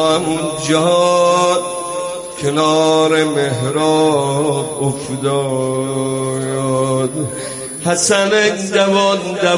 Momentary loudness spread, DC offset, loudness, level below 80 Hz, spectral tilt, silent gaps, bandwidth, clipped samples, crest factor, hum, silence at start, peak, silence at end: 9 LU; under 0.1%; -15 LUFS; -52 dBFS; -4 dB/octave; none; 11.5 kHz; under 0.1%; 14 dB; none; 0 s; -2 dBFS; 0 s